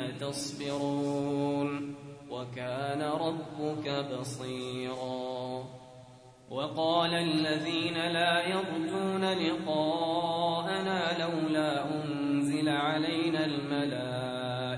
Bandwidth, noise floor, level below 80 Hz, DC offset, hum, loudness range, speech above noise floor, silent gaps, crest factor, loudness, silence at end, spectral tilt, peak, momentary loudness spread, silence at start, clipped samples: 11 kHz; -53 dBFS; -70 dBFS; under 0.1%; none; 6 LU; 22 dB; none; 18 dB; -31 LUFS; 0 s; -5 dB/octave; -14 dBFS; 9 LU; 0 s; under 0.1%